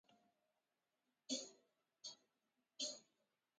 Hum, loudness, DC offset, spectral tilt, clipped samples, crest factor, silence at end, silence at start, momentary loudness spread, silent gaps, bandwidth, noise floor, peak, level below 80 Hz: none; -50 LUFS; under 0.1%; 0 dB/octave; under 0.1%; 26 dB; 0.55 s; 0.1 s; 19 LU; none; 9.6 kHz; under -90 dBFS; -30 dBFS; under -90 dBFS